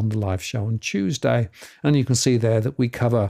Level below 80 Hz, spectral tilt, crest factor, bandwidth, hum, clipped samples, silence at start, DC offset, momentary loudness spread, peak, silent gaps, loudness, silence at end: -56 dBFS; -5.5 dB/octave; 14 dB; 15 kHz; none; under 0.1%; 0 s; under 0.1%; 7 LU; -6 dBFS; none; -22 LUFS; 0 s